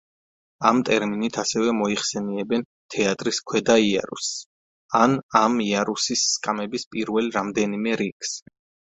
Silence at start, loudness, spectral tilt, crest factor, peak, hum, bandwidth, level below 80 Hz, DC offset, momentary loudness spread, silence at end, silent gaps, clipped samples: 0.6 s; -23 LUFS; -3.5 dB/octave; 22 dB; 0 dBFS; none; 8.2 kHz; -60 dBFS; under 0.1%; 9 LU; 0.45 s; 2.65-2.89 s, 4.46-4.89 s, 5.23-5.29 s, 6.87-6.91 s, 8.12-8.20 s; under 0.1%